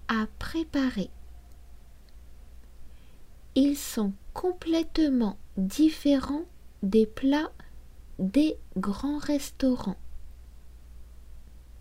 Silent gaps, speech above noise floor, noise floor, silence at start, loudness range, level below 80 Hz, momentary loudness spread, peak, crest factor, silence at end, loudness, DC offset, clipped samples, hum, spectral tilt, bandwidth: none; 21 dB; -48 dBFS; 0.05 s; 6 LU; -46 dBFS; 10 LU; -12 dBFS; 18 dB; 0 s; -28 LUFS; under 0.1%; under 0.1%; none; -5.5 dB/octave; 16 kHz